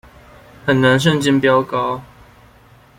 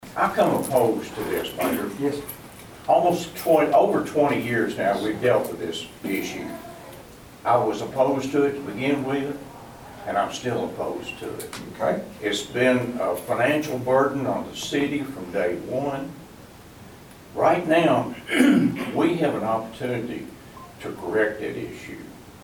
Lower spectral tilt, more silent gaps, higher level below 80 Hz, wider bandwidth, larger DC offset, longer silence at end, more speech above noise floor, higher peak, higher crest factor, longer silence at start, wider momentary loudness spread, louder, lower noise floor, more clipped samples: about the same, -5.5 dB/octave vs -5.5 dB/octave; neither; first, -48 dBFS vs -56 dBFS; second, 16.5 kHz vs over 20 kHz; neither; first, 0.95 s vs 0 s; first, 32 dB vs 22 dB; about the same, -2 dBFS vs -4 dBFS; about the same, 16 dB vs 20 dB; first, 0.65 s vs 0 s; second, 11 LU vs 17 LU; first, -16 LUFS vs -24 LUFS; about the same, -47 dBFS vs -45 dBFS; neither